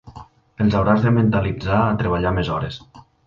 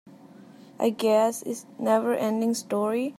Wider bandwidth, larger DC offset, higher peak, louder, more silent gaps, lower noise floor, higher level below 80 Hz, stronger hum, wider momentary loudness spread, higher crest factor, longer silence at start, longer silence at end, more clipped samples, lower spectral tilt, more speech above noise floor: second, 7.2 kHz vs 15.5 kHz; neither; first, -2 dBFS vs -10 dBFS; first, -19 LUFS vs -25 LUFS; neither; second, -43 dBFS vs -49 dBFS; first, -36 dBFS vs -82 dBFS; neither; about the same, 9 LU vs 8 LU; about the same, 16 dB vs 16 dB; about the same, 0.05 s vs 0.05 s; first, 0.25 s vs 0.05 s; neither; first, -9 dB/octave vs -4.5 dB/octave; about the same, 24 dB vs 24 dB